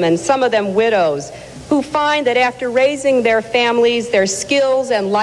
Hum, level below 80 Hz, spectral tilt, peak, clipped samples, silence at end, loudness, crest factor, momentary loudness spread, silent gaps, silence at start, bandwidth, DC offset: none; -52 dBFS; -3.5 dB/octave; -2 dBFS; under 0.1%; 0 s; -15 LUFS; 14 dB; 5 LU; none; 0 s; 12 kHz; under 0.1%